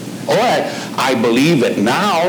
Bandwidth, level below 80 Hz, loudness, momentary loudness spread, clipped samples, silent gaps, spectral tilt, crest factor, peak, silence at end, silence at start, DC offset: over 20 kHz; -62 dBFS; -15 LUFS; 6 LU; under 0.1%; none; -5 dB/octave; 12 dB; -4 dBFS; 0 s; 0 s; under 0.1%